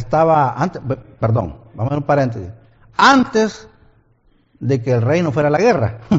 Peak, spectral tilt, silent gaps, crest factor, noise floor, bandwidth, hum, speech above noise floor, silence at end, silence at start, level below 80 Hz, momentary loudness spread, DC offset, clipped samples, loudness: 0 dBFS; -5.5 dB/octave; none; 16 dB; -56 dBFS; 7.8 kHz; none; 41 dB; 0 s; 0 s; -46 dBFS; 14 LU; under 0.1%; under 0.1%; -16 LUFS